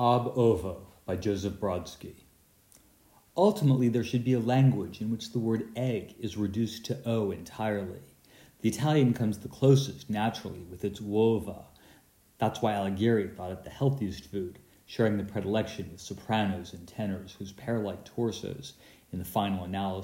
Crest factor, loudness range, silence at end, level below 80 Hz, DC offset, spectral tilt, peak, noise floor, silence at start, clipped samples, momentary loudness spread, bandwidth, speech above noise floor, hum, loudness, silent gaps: 20 dB; 6 LU; 0 s; -62 dBFS; under 0.1%; -7 dB/octave; -10 dBFS; -62 dBFS; 0 s; under 0.1%; 15 LU; 16 kHz; 33 dB; none; -30 LUFS; none